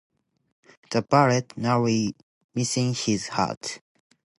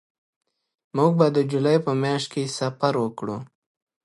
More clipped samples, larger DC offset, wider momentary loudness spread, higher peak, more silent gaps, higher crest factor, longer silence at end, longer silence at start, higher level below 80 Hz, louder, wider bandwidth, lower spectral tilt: neither; neither; about the same, 14 LU vs 12 LU; about the same, -4 dBFS vs -4 dBFS; first, 2.23-2.49 s, 3.57-3.61 s vs none; about the same, 22 dB vs 20 dB; about the same, 0.6 s vs 0.6 s; about the same, 0.9 s vs 0.95 s; first, -62 dBFS vs -70 dBFS; about the same, -25 LUFS vs -23 LUFS; about the same, 11.5 kHz vs 11.5 kHz; second, -5 dB/octave vs -6.5 dB/octave